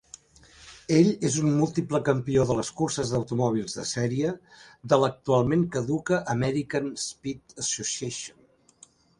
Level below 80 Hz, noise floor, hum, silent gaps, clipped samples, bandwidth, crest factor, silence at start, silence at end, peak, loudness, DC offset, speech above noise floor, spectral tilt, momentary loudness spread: -56 dBFS; -57 dBFS; none; none; under 0.1%; 11.5 kHz; 22 dB; 0.6 s; 0.9 s; -4 dBFS; -26 LUFS; under 0.1%; 31 dB; -5.5 dB/octave; 10 LU